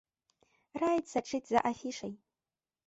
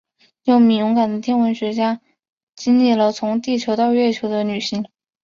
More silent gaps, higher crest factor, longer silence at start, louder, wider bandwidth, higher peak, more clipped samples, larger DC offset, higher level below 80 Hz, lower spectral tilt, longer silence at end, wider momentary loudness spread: second, none vs 2.32-2.47 s; first, 20 dB vs 14 dB; first, 0.75 s vs 0.45 s; second, -34 LUFS vs -18 LUFS; first, 8.2 kHz vs 7.4 kHz; second, -16 dBFS vs -4 dBFS; neither; neither; second, -72 dBFS vs -62 dBFS; about the same, -4.5 dB/octave vs -5.5 dB/octave; first, 0.7 s vs 0.4 s; first, 15 LU vs 11 LU